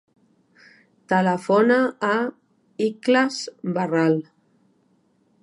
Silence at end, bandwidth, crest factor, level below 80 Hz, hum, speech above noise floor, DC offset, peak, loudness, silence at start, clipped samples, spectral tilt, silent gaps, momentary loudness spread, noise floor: 1.2 s; 11 kHz; 18 dB; -76 dBFS; none; 43 dB; under 0.1%; -6 dBFS; -21 LUFS; 1.1 s; under 0.1%; -6 dB/octave; none; 9 LU; -63 dBFS